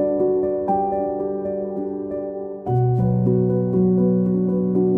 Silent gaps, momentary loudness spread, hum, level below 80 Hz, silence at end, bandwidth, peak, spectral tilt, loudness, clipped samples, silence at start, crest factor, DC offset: none; 9 LU; none; -48 dBFS; 0 s; 2.5 kHz; -8 dBFS; -13.5 dB/octave; -21 LUFS; under 0.1%; 0 s; 12 dB; under 0.1%